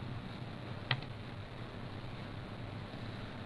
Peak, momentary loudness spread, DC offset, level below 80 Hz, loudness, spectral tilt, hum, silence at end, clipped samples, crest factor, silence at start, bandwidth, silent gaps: -16 dBFS; 8 LU; under 0.1%; -56 dBFS; -44 LUFS; -6.5 dB/octave; none; 0 s; under 0.1%; 26 dB; 0 s; 11 kHz; none